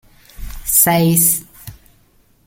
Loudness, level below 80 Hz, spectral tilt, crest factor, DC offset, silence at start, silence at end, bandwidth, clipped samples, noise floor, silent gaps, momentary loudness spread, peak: -12 LUFS; -38 dBFS; -4 dB/octave; 18 dB; under 0.1%; 0.4 s; 0.75 s; 17 kHz; under 0.1%; -54 dBFS; none; 15 LU; 0 dBFS